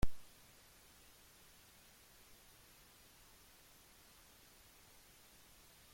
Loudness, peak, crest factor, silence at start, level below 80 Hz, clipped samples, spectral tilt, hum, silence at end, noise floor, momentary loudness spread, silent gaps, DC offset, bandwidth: -60 LUFS; -20 dBFS; 24 dB; 0.05 s; -56 dBFS; under 0.1%; -4.5 dB/octave; none; 3.6 s; -64 dBFS; 0 LU; none; under 0.1%; 16.5 kHz